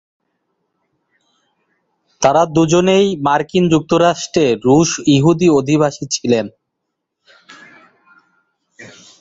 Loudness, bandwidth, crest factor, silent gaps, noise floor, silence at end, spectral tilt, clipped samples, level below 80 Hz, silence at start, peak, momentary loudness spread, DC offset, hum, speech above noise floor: -14 LUFS; 8 kHz; 16 dB; none; -75 dBFS; 0.35 s; -5.5 dB/octave; under 0.1%; -52 dBFS; 2.2 s; -2 dBFS; 5 LU; under 0.1%; none; 62 dB